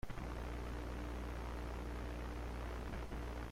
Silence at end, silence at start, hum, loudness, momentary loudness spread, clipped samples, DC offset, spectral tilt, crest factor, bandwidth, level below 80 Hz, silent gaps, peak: 0 s; 0.05 s; none; -46 LUFS; 1 LU; under 0.1%; under 0.1%; -6.5 dB/octave; 12 dB; 15.5 kHz; -46 dBFS; none; -32 dBFS